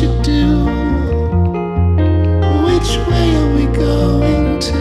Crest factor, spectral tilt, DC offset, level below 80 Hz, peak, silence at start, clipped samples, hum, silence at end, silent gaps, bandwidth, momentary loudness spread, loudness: 10 dB; -7 dB/octave; under 0.1%; -18 dBFS; -4 dBFS; 0 s; under 0.1%; none; 0 s; none; 12 kHz; 3 LU; -14 LUFS